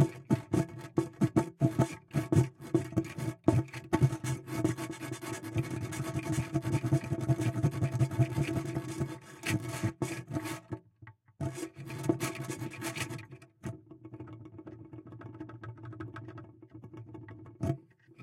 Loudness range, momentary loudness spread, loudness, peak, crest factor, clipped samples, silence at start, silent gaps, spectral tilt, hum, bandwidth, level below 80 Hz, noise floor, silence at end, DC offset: 15 LU; 19 LU; -34 LUFS; -12 dBFS; 22 dB; under 0.1%; 0 s; none; -6.5 dB/octave; none; 16 kHz; -58 dBFS; -57 dBFS; 0 s; under 0.1%